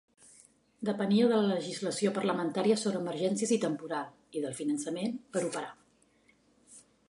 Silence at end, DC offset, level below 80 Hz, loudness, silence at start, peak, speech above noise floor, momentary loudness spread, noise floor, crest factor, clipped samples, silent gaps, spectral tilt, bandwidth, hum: 0.3 s; under 0.1%; -80 dBFS; -31 LUFS; 0.8 s; -14 dBFS; 36 dB; 11 LU; -67 dBFS; 18 dB; under 0.1%; none; -5 dB/octave; 11.5 kHz; none